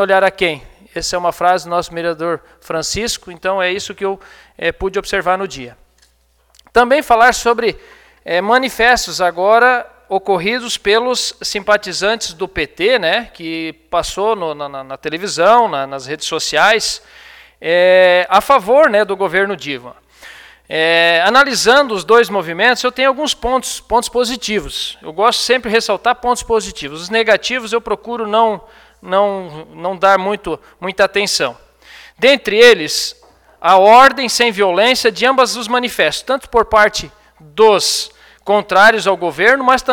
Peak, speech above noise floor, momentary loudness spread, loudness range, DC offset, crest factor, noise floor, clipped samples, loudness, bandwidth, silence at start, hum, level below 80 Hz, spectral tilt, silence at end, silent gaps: 0 dBFS; 42 dB; 13 LU; 7 LU; under 0.1%; 14 dB; -56 dBFS; under 0.1%; -14 LUFS; 18.5 kHz; 0 s; none; -42 dBFS; -2.5 dB/octave; 0 s; none